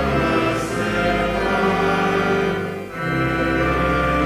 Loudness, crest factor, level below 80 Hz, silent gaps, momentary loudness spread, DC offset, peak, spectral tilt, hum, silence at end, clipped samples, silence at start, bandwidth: -20 LUFS; 14 dB; -34 dBFS; none; 4 LU; under 0.1%; -6 dBFS; -6 dB/octave; none; 0 s; under 0.1%; 0 s; 16 kHz